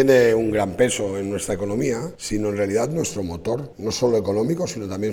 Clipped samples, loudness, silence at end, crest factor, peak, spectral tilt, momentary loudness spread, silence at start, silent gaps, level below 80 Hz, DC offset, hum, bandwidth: under 0.1%; -22 LUFS; 0 s; 16 dB; -4 dBFS; -5 dB/octave; 8 LU; 0 s; none; -48 dBFS; under 0.1%; none; 18.5 kHz